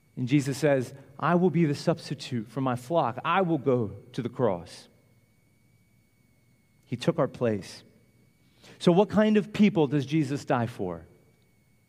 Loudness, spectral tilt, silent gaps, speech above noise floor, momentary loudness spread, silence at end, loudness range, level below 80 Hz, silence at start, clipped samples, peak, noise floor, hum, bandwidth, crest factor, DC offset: -27 LUFS; -7 dB/octave; none; 38 dB; 13 LU; 0.85 s; 8 LU; -66 dBFS; 0.15 s; under 0.1%; -8 dBFS; -64 dBFS; none; 15 kHz; 20 dB; under 0.1%